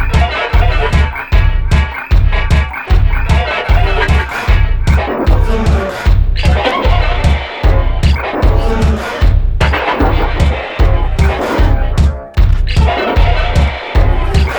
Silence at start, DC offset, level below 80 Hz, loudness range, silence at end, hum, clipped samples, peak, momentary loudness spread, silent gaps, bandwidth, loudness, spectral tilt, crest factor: 0 s; under 0.1%; -12 dBFS; 0 LU; 0 s; none; 0.1%; 0 dBFS; 2 LU; none; over 20 kHz; -13 LUFS; -6.5 dB/octave; 10 dB